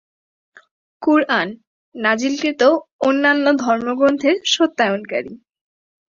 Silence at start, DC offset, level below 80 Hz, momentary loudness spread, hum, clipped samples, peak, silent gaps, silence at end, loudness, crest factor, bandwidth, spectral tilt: 1 s; under 0.1%; -64 dBFS; 8 LU; none; under 0.1%; -2 dBFS; 1.67-1.92 s, 2.93-2.99 s; 0.75 s; -17 LUFS; 18 dB; 7.6 kHz; -3.5 dB/octave